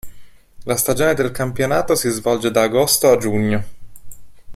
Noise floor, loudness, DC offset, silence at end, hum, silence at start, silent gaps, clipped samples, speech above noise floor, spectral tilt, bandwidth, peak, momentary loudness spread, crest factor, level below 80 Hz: -37 dBFS; -17 LUFS; under 0.1%; 0 s; none; 0.05 s; none; under 0.1%; 21 dB; -4 dB/octave; 16 kHz; -2 dBFS; 8 LU; 16 dB; -44 dBFS